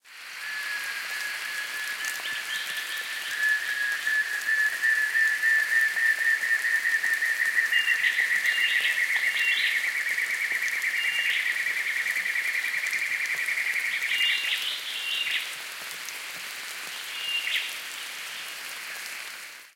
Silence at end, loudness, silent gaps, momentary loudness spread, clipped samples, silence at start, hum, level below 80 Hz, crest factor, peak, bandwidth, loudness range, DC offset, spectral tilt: 0.05 s; -25 LUFS; none; 12 LU; under 0.1%; 0.05 s; none; -88 dBFS; 18 dB; -10 dBFS; 17 kHz; 8 LU; under 0.1%; 3 dB/octave